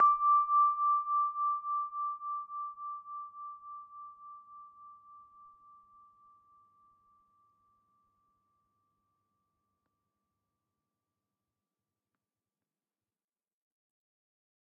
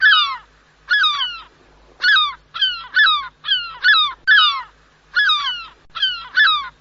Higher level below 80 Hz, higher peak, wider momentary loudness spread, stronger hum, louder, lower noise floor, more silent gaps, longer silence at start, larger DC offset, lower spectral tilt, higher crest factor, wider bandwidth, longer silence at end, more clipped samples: second, -82 dBFS vs -56 dBFS; second, -18 dBFS vs -2 dBFS; first, 25 LU vs 12 LU; neither; second, -31 LUFS vs -15 LUFS; first, under -90 dBFS vs -50 dBFS; neither; about the same, 0 s vs 0 s; neither; first, 3.5 dB/octave vs 7 dB/octave; about the same, 20 dB vs 16 dB; second, 2.5 kHz vs 7.6 kHz; first, 9.45 s vs 0.1 s; neither